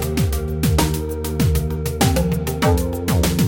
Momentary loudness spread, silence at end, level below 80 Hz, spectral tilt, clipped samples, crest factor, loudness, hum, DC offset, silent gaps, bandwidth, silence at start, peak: 4 LU; 0 s; -26 dBFS; -5.5 dB/octave; under 0.1%; 16 dB; -20 LUFS; none; under 0.1%; none; 17 kHz; 0 s; -2 dBFS